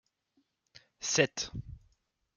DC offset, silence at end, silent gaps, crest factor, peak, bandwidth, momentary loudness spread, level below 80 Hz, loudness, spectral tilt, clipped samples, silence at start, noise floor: under 0.1%; 0.6 s; none; 26 dB; -10 dBFS; 10.5 kHz; 18 LU; -58 dBFS; -31 LUFS; -2.5 dB/octave; under 0.1%; 1 s; -76 dBFS